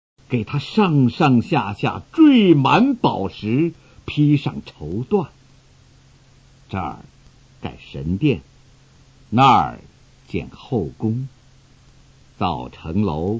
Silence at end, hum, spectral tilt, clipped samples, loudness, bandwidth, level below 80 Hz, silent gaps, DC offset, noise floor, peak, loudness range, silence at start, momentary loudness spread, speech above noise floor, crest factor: 0 s; none; -8 dB/octave; under 0.1%; -19 LUFS; 7.6 kHz; -44 dBFS; none; under 0.1%; -51 dBFS; 0 dBFS; 11 LU; 0.3 s; 17 LU; 32 dB; 20 dB